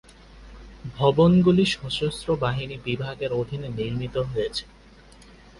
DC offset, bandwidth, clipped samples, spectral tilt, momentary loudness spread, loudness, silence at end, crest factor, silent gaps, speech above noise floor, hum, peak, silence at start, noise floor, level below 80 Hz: under 0.1%; 11.5 kHz; under 0.1%; -6.5 dB/octave; 13 LU; -24 LUFS; 0.95 s; 18 dB; none; 27 dB; none; -6 dBFS; 0.35 s; -50 dBFS; -46 dBFS